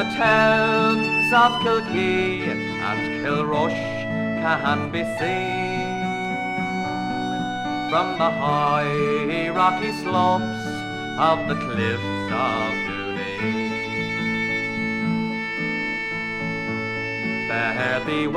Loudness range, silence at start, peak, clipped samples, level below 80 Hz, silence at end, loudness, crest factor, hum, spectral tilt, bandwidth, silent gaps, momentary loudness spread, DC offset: 4 LU; 0 s; -4 dBFS; under 0.1%; -54 dBFS; 0 s; -22 LUFS; 18 dB; none; -5.5 dB/octave; 14 kHz; none; 8 LU; under 0.1%